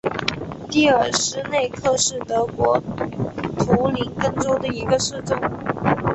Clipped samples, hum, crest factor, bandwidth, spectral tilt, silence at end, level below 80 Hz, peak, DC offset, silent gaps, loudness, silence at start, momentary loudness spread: under 0.1%; none; 18 dB; 8.4 kHz; -4 dB/octave; 0 s; -46 dBFS; -2 dBFS; under 0.1%; none; -21 LUFS; 0.05 s; 8 LU